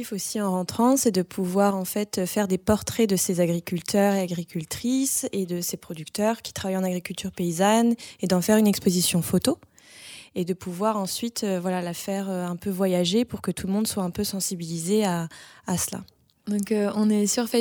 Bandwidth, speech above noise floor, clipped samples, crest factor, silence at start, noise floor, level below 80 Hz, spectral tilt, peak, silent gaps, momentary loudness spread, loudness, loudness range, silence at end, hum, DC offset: over 20 kHz; 21 dB; under 0.1%; 18 dB; 0 s; -46 dBFS; -56 dBFS; -4.5 dB/octave; -6 dBFS; none; 9 LU; -25 LUFS; 4 LU; 0 s; none; under 0.1%